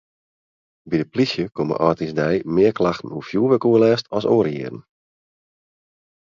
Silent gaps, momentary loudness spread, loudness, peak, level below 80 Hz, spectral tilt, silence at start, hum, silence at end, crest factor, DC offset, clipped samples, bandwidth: none; 10 LU; -20 LUFS; 0 dBFS; -54 dBFS; -7 dB/octave; 0.85 s; none; 1.4 s; 20 dB; under 0.1%; under 0.1%; 7.4 kHz